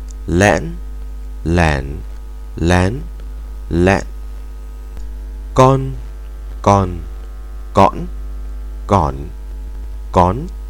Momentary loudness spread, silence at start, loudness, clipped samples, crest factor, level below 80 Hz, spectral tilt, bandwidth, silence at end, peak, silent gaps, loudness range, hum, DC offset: 19 LU; 0 s; -16 LUFS; 0.3%; 18 dB; -26 dBFS; -6.5 dB/octave; 16.5 kHz; 0 s; 0 dBFS; none; 3 LU; none; under 0.1%